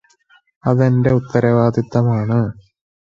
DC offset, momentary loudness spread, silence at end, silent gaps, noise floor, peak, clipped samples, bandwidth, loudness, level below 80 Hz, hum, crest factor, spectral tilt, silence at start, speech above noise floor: under 0.1%; 5 LU; 0.55 s; none; -55 dBFS; 0 dBFS; under 0.1%; 7 kHz; -16 LUFS; -48 dBFS; none; 16 dB; -9.5 dB/octave; 0.65 s; 40 dB